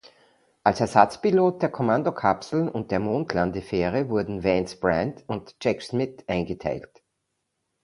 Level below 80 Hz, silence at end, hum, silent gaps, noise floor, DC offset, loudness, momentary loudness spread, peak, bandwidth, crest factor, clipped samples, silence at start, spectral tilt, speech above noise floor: -52 dBFS; 1 s; none; none; -78 dBFS; under 0.1%; -25 LUFS; 9 LU; 0 dBFS; 11.5 kHz; 24 dB; under 0.1%; 0.65 s; -6.5 dB/octave; 54 dB